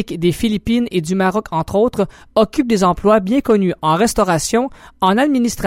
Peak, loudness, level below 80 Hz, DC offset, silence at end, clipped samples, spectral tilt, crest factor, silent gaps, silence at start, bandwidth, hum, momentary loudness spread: -2 dBFS; -16 LUFS; -38 dBFS; under 0.1%; 0 s; under 0.1%; -5.5 dB/octave; 14 dB; none; 0 s; 16.5 kHz; none; 5 LU